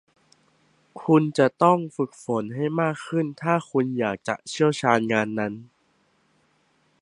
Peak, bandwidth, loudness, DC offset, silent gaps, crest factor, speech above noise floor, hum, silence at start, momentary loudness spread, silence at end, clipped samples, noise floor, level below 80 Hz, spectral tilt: -4 dBFS; 11 kHz; -24 LUFS; under 0.1%; none; 22 dB; 43 dB; none; 0.95 s; 10 LU; 1.35 s; under 0.1%; -66 dBFS; -68 dBFS; -6.5 dB/octave